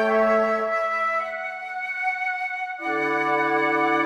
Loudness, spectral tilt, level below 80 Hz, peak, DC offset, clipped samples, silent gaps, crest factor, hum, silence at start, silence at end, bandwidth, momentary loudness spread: -23 LUFS; -5 dB/octave; -64 dBFS; -10 dBFS; under 0.1%; under 0.1%; none; 14 dB; none; 0 s; 0 s; 13 kHz; 9 LU